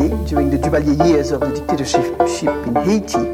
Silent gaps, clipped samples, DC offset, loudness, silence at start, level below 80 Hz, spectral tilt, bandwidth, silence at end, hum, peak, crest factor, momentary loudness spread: none; under 0.1%; under 0.1%; -17 LUFS; 0 s; -30 dBFS; -6 dB/octave; 16.5 kHz; 0 s; none; -2 dBFS; 14 dB; 5 LU